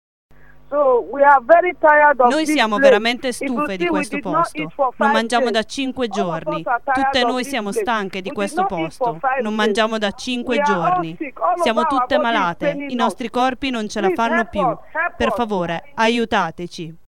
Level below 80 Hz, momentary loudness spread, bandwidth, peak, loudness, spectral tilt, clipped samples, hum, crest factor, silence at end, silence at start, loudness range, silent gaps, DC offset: -50 dBFS; 9 LU; 16 kHz; 0 dBFS; -18 LUFS; -4.5 dB/octave; under 0.1%; none; 18 dB; 0.15 s; 0.7 s; 6 LU; none; 1%